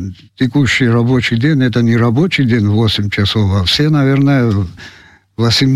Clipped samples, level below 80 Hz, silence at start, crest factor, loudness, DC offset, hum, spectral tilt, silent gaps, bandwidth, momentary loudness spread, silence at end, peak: under 0.1%; -40 dBFS; 0 s; 10 dB; -12 LUFS; 0.3%; none; -6 dB/octave; none; 14 kHz; 6 LU; 0 s; -2 dBFS